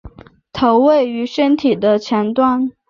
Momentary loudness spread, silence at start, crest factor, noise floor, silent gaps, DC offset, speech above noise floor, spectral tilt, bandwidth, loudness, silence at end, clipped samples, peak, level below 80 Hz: 6 LU; 0.05 s; 14 dB; -39 dBFS; none; under 0.1%; 25 dB; -6.5 dB/octave; 7.2 kHz; -15 LUFS; 0.2 s; under 0.1%; -2 dBFS; -48 dBFS